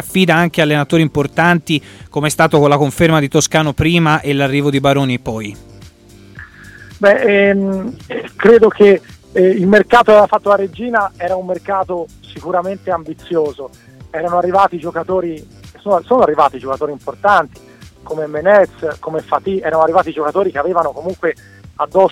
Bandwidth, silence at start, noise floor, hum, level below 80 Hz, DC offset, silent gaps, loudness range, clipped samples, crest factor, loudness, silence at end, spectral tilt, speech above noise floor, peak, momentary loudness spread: 16.5 kHz; 0 s; -41 dBFS; none; -44 dBFS; under 0.1%; none; 7 LU; under 0.1%; 14 dB; -14 LUFS; 0 s; -5.5 dB/octave; 28 dB; 0 dBFS; 13 LU